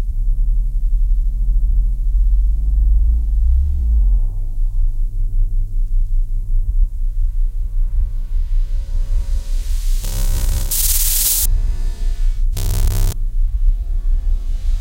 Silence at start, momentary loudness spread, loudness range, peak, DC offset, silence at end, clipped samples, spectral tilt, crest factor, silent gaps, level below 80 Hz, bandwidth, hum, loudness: 0 s; 8 LU; 6 LU; -2 dBFS; under 0.1%; 0 s; under 0.1%; -3 dB/octave; 12 dB; none; -14 dBFS; 17 kHz; none; -21 LUFS